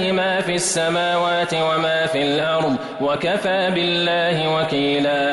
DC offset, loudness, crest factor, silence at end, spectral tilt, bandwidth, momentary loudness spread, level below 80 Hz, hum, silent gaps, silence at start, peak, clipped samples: under 0.1%; -19 LUFS; 10 dB; 0 s; -3.5 dB/octave; 11.5 kHz; 2 LU; -58 dBFS; none; none; 0 s; -8 dBFS; under 0.1%